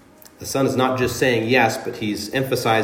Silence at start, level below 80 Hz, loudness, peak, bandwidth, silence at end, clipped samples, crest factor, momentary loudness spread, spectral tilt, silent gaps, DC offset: 0.4 s; -54 dBFS; -20 LUFS; -2 dBFS; 16.5 kHz; 0 s; under 0.1%; 18 dB; 9 LU; -4.5 dB/octave; none; under 0.1%